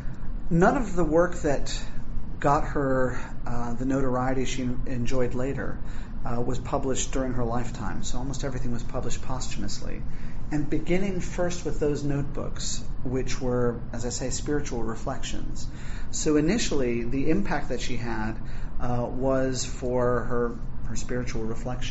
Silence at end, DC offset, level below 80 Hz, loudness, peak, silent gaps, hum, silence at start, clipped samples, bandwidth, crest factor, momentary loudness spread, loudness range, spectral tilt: 0 s; under 0.1%; -32 dBFS; -29 LUFS; -6 dBFS; none; none; 0 s; under 0.1%; 8 kHz; 18 dB; 12 LU; 4 LU; -6 dB/octave